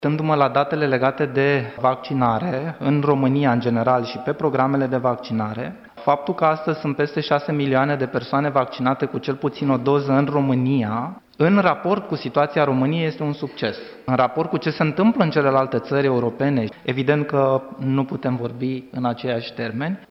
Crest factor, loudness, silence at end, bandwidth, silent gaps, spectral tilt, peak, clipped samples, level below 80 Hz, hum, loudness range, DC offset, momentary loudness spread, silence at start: 16 dB; -21 LUFS; 0.05 s; 6 kHz; none; -9 dB/octave; -4 dBFS; under 0.1%; -60 dBFS; none; 2 LU; under 0.1%; 8 LU; 0 s